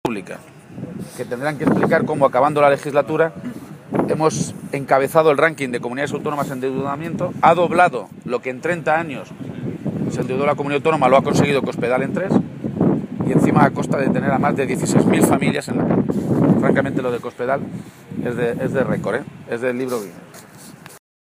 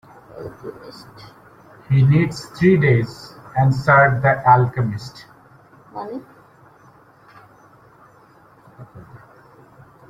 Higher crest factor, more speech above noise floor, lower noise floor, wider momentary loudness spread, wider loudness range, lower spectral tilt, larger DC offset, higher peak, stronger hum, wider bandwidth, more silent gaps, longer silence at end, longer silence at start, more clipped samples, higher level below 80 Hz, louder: about the same, 18 dB vs 20 dB; second, 22 dB vs 33 dB; second, -40 dBFS vs -50 dBFS; second, 15 LU vs 24 LU; second, 5 LU vs 23 LU; second, -6.5 dB/octave vs -8 dB/octave; neither; about the same, 0 dBFS vs -2 dBFS; neither; first, 15.5 kHz vs 9.4 kHz; neither; second, 0.35 s vs 1.1 s; second, 0.05 s vs 0.35 s; neither; about the same, -52 dBFS vs -52 dBFS; second, -19 LUFS vs -16 LUFS